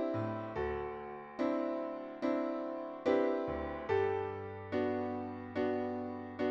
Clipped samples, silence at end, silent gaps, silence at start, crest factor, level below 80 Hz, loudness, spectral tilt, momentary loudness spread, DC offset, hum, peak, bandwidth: under 0.1%; 0 s; none; 0 s; 18 dB; -60 dBFS; -37 LUFS; -8 dB/octave; 8 LU; under 0.1%; none; -18 dBFS; 7.2 kHz